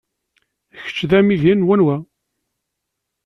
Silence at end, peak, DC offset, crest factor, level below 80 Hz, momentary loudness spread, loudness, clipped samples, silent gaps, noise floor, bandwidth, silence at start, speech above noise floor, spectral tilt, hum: 1.2 s; -2 dBFS; under 0.1%; 16 dB; -52 dBFS; 13 LU; -16 LUFS; under 0.1%; none; -78 dBFS; 6.6 kHz; 0.75 s; 63 dB; -8 dB/octave; none